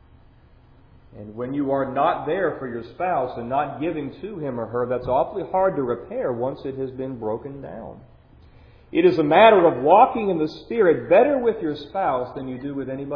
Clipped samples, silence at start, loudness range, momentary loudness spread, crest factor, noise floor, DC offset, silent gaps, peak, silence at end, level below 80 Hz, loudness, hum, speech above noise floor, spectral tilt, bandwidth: under 0.1%; 1.15 s; 9 LU; 16 LU; 22 dB; -51 dBFS; under 0.1%; none; 0 dBFS; 0 s; -52 dBFS; -21 LUFS; none; 30 dB; -8.5 dB/octave; 5.4 kHz